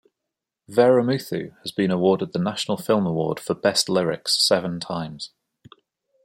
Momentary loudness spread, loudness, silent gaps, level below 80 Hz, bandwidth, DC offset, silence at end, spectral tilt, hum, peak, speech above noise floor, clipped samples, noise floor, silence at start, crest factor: 12 LU; -22 LUFS; none; -64 dBFS; 16.5 kHz; under 0.1%; 0.95 s; -4.5 dB/octave; none; -4 dBFS; 63 dB; under 0.1%; -84 dBFS; 0.7 s; 20 dB